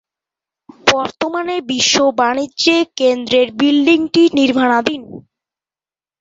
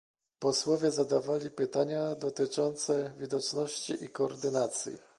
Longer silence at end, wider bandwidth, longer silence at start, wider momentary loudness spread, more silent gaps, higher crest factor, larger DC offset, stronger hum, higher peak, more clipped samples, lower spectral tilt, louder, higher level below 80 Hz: first, 1 s vs 0.2 s; second, 8 kHz vs 11.5 kHz; first, 0.85 s vs 0.4 s; about the same, 8 LU vs 6 LU; neither; about the same, 16 dB vs 16 dB; neither; neither; first, 0 dBFS vs -16 dBFS; neither; second, -2.5 dB/octave vs -4 dB/octave; first, -14 LUFS vs -32 LUFS; first, -56 dBFS vs -76 dBFS